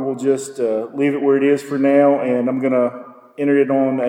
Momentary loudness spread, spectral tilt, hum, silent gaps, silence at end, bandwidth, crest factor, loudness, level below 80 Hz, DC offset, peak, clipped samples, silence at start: 7 LU; -6.5 dB/octave; none; none; 0 s; 11.5 kHz; 14 dB; -17 LUFS; -74 dBFS; under 0.1%; -2 dBFS; under 0.1%; 0 s